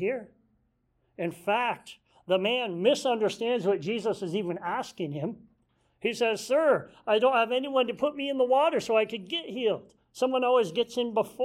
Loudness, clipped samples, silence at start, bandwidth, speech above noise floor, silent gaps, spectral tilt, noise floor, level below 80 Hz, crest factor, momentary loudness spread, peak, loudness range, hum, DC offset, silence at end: -28 LUFS; under 0.1%; 0 s; 14.5 kHz; 45 dB; none; -4.5 dB/octave; -72 dBFS; -72 dBFS; 18 dB; 10 LU; -10 dBFS; 4 LU; none; under 0.1%; 0 s